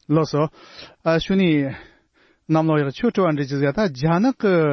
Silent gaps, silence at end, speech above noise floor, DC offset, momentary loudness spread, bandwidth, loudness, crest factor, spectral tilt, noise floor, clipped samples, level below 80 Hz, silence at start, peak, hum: none; 0 s; 40 dB; under 0.1%; 9 LU; 6.4 kHz; -20 LUFS; 12 dB; -7.5 dB/octave; -60 dBFS; under 0.1%; -50 dBFS; 0.1 s; -8 dBFS; none